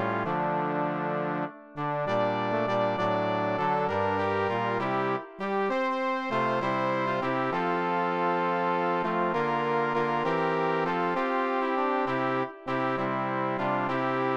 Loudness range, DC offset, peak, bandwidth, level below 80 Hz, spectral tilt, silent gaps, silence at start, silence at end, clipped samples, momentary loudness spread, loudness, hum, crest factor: 1 LU; 0.2%; -14 dBFS; 9.2 kHz; -66 dBFS; -7 dB/octave; none; 0 s; 0 s; under 0.1%; 3 LU; -28 LUFS; none; 14 dB